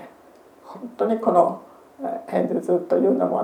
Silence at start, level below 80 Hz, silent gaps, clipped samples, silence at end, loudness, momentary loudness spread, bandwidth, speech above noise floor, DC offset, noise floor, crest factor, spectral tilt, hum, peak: 0 s; -74 dBFS; none; under 0.1%; 0 s; -22 LUFS; 19 LU; 13 kHz; 29 dB; under 0.1%; -50 dBFS; 20 dB; -8.5 dB/octave; none; -4 dBFS